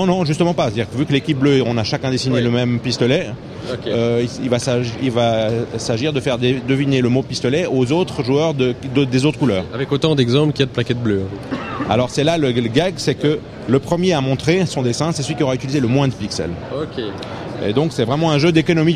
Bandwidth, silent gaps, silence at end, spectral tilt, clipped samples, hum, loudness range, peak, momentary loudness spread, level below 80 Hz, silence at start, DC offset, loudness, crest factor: 11.5 kHz; none; 0 s; -6 dB/octave; under 0.1%; none; 2 LU; 0 dBFS; 8 LU; -46 dBFS; 0 s; under 0.1%; -18 LUFS; 16 dB